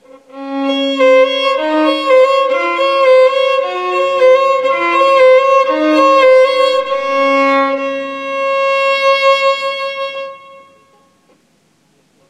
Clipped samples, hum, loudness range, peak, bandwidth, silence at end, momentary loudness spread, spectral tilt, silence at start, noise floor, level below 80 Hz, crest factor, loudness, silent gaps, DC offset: under 0.1%; none; 5 LU; 0 dBFS; 9.8 kHz; 1.75 s; 11 LU; -2.5 dB/octave; 0.35 s; -55 dBFS; -66 dBFS; 12 dB; -11 LUFS; none; under 0.1%